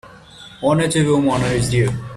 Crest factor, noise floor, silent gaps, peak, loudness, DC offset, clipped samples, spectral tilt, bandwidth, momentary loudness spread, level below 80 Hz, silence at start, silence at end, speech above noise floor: 14 dB; -41 dBFS; none; -4 dBFS; -17 LUFS; under 0.1%; under 0.1%; -5.5 dB/octave; 13.5 kHz; 3 LU; -40 dBFS; 0.05 s; 0 s; 24 dB